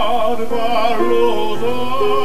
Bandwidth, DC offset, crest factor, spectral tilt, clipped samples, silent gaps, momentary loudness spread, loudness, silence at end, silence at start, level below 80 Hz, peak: 15.5 kHz; 20%; 12 dB; -5 dB/octave; under 0.1%; none; 5 LU; -18 LUFS; 0 s; 0 s; -42 dBFS; -2 dBFS